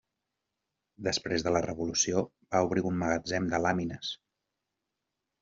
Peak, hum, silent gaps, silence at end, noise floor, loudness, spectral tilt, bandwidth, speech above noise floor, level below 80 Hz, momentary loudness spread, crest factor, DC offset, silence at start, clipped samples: -12 dBFS; none; none; 1.25 s; -86 dBFS; -30 LUFS; -4 dB/octave; 7.8 kHz; 56 dB; -60 dBFS; 8 LU; 20 dB; under 0.1%; 1 s; under 0.1%